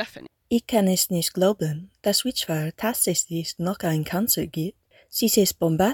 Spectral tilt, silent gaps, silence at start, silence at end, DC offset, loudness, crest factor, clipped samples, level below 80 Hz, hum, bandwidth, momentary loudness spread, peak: -4 dB/octave; none; 0 s; 0 s; under 0.1%; -23 LUFS; 18 dB; under 0.1%; -56 dBFS; none; 18 kHz; 9 LU; -6 dBFS